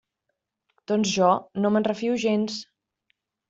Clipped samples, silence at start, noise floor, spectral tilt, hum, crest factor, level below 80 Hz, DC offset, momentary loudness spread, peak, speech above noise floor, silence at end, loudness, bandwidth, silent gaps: under 0.1%; 0.9 s; -80 dBFS; -5 dB/octave; none; 20 dB; -68 dBFS; under 0.1%; 7 LU; -6 dBFS; 57 dB; 0.85 s; -24 LUFS; 8 kHz; none